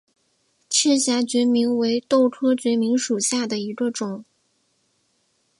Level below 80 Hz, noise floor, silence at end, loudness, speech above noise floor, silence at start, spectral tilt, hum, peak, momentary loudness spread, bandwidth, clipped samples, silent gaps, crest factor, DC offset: -74 dBFS; -68 dBFS; 1.4 s; -21 LUFS; 47 dB; 0.7 s; -3 dB/octave; none; -4 dBFS; 8 LU; 11.5 kHz; under 0.1%; none; 18 dB; under 0.1%